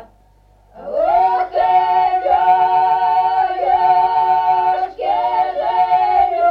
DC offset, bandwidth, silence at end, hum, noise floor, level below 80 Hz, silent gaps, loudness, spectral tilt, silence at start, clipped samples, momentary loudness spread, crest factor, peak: under 0.1%; 5.4 kHz; 0 s; none; -51 dBFS; -50 dBFS; none; -15 LUFS; -5.5 dB/octave; 0 s; under 0.1%; 5 LU; 12 dB; -4 dBFS